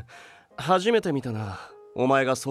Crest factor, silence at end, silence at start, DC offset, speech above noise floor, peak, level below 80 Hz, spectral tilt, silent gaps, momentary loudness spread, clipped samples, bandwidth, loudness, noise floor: 18 dB; 0 s; 0 s; under 0.1%; 25 dB; -8 dBFS; -64 dBFS; -5 dB/octave; none; 19 LU; under 0.1%; 14.5 kHz; -25 LUFS; -50 dBFS